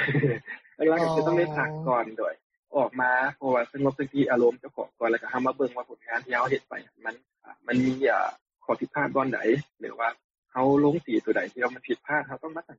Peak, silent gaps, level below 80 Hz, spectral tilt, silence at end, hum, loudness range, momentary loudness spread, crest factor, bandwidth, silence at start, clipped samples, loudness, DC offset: -10 dBFS; 2.43-2.50 s, 2.57-2.63 s, 8.42-8.46 s, 10.24-10.43 s; -68 dBFS; -5.5 dB/octave; 0.05 s; none; 3 LU; 14 LU; 16 dB; 7.6 kHz; 0 s; under 0.1%; -27 LUFS; under 0.1%